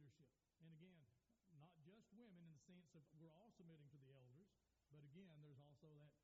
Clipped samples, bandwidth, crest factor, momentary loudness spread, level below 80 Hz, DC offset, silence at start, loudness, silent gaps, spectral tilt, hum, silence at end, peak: under 0.1%; 7.4 kHz; 14 dB; 3 LU; under -90 dBFS; under 0.1%; 0 s; -68 LUFS; none; -7 dB/octave; none; 0 s; -54 dBFS